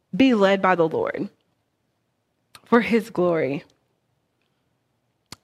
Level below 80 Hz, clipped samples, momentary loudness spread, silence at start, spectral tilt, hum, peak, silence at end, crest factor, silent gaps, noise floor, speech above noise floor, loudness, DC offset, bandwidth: -64 dBFS; under 0.1%; 13 LU; 0.15 s; -6.5 dB/octave; none; -2 dBFS; 1.8 s; 22 dB; none; -72 dBFS; 53 dB; -21 LUFS; under 0.1%; 13.5 kHz